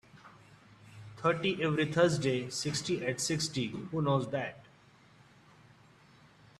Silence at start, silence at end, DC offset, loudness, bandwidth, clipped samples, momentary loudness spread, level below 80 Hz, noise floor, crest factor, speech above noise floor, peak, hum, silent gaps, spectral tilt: 0.15 s; 2 s; under 0.1%; -32 LUFS; 13 kHz; under 0.1%; 9 LU; -66 dBFS; -61 dBFS; 20 dB; 29 dB; -14 dBFS; none; none; -4.5 dB/octave